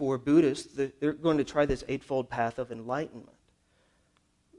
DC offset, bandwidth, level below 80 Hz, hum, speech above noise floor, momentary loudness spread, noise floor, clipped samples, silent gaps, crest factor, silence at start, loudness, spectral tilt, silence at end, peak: under 0.1%; 11 kHz; -52 dBFS; none; 41 dB; 10 LU; -70 dBFS; under 0.1%; none; 18 dB; 0 s; -29 LUFS; -6.5 dB/octave; 1.35 s; -12 dBFS